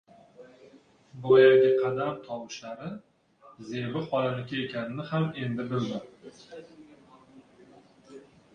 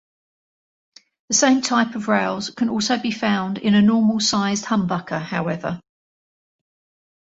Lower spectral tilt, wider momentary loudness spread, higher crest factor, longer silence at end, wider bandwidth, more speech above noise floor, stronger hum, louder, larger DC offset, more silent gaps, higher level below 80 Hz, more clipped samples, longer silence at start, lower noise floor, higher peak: first, -7 dB/octave vs -4 dB/octave; first, 27 LU vs 9 LU; about the same, 22 dB vs 18 dB; second, 0.35 s vs 1.4 s; second, 6.8 kHz vs 8 kHz; second, 31 dB vs over 70 dB; neither; second, -27 LUFS vs -20 LUFS; neither; neither; second, -70 dBFS vs -60 dBFS; neither; second, 0.4 s vs 1.3 s; second, -57 dBFS vs under -90 dBFS; second, -8 dBFS vs -2 dBFS